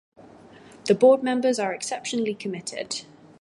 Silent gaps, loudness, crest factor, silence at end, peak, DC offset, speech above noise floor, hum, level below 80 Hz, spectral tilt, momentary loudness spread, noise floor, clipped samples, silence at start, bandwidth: none; -24 LUFS; 18 dB; 0.4 s; -6 dBFS; under 0.1%; 26 dB; none; -72 dBFS; -4 dB/octave; 14 LU; -48 dBFS; under 0.1%; 0.85 s; 11.5 kHz